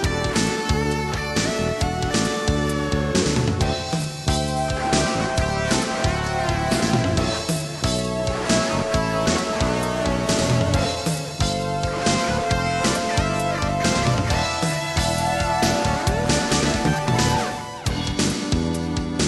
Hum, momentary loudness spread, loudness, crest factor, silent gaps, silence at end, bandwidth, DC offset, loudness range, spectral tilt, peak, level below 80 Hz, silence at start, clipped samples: none; 4 LU; -22 LUFS; 16 dB; none; 0 s; 13 kHz; under 0.1%; 1 LU; -4.5 dB/octave; -6 dBFS; -34 dBFS; 0 s; under 0.1%